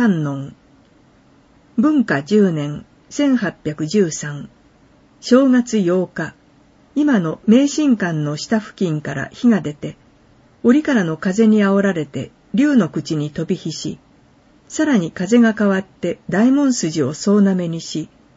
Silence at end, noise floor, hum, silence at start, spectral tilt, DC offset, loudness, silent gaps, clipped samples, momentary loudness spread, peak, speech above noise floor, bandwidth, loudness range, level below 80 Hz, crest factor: 0.3 s; -51 dBFS; none; 0 s; -6 dB/octave; under 0.1%; -17 LUFS; none; under 0.1%; 14 LU; 0 dBFS; 35 dB; 8 kHz; 3 LU; -56 dBFS; 18 dB